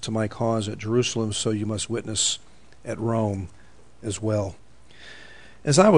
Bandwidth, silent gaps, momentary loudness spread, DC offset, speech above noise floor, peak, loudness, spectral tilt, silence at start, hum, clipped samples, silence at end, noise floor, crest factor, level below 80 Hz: 10.5 kHz; none; 18 LU; 0.5%; 26 dB; -4 dBFS; -25 LUFS; -4.5 dB/octave; 0 s; none; under 0.1%; 0 s; -49 dBFS; 20 dB; -56 dBFS